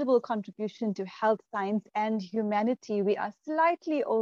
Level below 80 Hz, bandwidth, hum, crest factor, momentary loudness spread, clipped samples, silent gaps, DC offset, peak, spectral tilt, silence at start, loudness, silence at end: -82 dBFS; 7.2 kHz; none; 16 dB; 7 LU; under 0.1%; none; under 0.1%; -12 dBFS; -7 dB/octave; 0 s; -30 LUFS; 0 s